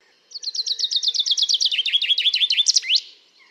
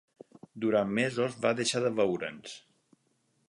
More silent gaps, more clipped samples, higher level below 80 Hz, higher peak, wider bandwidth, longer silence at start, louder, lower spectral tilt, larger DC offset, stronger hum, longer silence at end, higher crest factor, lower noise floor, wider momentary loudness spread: neither; neither; second, under -90 dBFS vs -72 dBFS; first, -4 dBFS vs -12 dBFS; first, 15.5 kHz vs 11.5 kHz; second, 0.35 s vs 0.55 s; first, -18 LUFS vs -30 LUFS; second, 7.5 dB/octave vs -4.5 dB/octave; neither; neither; second, 0.4 s vs 0.9 s; about the same, 18 dB vs 20 dB; second, -47 dBFS vs -73 dBFS; second, 9 LU vs 18 LU